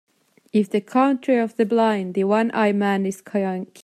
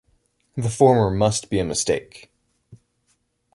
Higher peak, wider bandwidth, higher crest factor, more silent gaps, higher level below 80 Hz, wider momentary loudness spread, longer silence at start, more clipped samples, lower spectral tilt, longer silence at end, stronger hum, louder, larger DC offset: second, -6 dBFS vs -2 dBFS; first, 13 kHz vs 11.5 kHz; second, 14 dB vs 20 dB; neither; second, -74 dBFS vs -46 dBFS; second, 6 LU vs 11 LU; about the same, 0.55 s vs 0.55 s; neither; first, -7 dB/octave vs -5 dB/octave; second, 0.2 s vs 0.8 s; neither; about the same, -21 LUFS vs -20 LUFS; neither